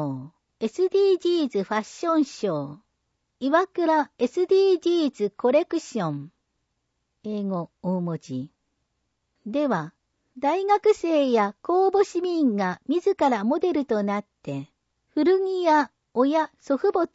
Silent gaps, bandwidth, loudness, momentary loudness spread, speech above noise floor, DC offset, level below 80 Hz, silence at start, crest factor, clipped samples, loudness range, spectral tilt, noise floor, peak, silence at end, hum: none; 8 kHz; -24 LUFS; 11 LU; 54 dB; under 0.1%; -70 dBFS; 0 s; 16 dB; under 0.1%; 8 LU; -6.5 dB/octave; -77 dBFS; -8 dBFS; 0.1 s; none